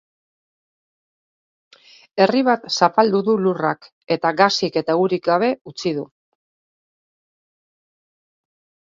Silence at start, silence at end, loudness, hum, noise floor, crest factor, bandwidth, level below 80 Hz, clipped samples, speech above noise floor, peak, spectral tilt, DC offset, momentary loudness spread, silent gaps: 2.15 s; 2.95 s; -19 LUFS; none; under -90 dBFS; 22 dB; 7.6 kHz; -68 dBFS; under 0.1%; over 72 dB; 0 dBFS; -5 dB/octave; under 0.1%; 9 LU; 3.92-4.01 s, 5.61-5.65 s